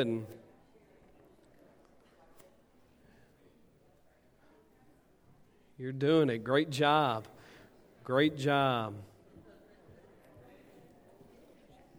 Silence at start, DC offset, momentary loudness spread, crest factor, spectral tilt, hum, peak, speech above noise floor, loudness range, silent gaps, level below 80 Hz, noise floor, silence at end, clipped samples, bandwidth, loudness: 0 s; under 0.1%; 23 LU; 24 dB; -6 dB/octave; none; -12 dBFS; 35 dB; 12 LU; none; -72 dBFS; -65 dBFS; 2.95 s; under 0.1%; 16.5 kHz; -30 LUFS